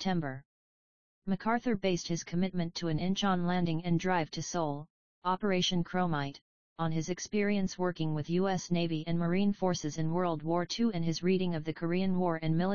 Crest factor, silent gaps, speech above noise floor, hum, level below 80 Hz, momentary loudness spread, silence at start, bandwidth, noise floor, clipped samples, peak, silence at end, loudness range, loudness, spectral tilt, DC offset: 16 dB; 0.45-1.22 s, 4.90-5.22 s, 6.41-6.76 s; over 59 dB; none; -58 dBFS; 5 LU; 0 s; 7.2 kHz; under -90 dBFS; under 0.1%; -14 dBFS; 0 s; 2 LU; -32 LUFS; -5.5 dB/octave; 0.6%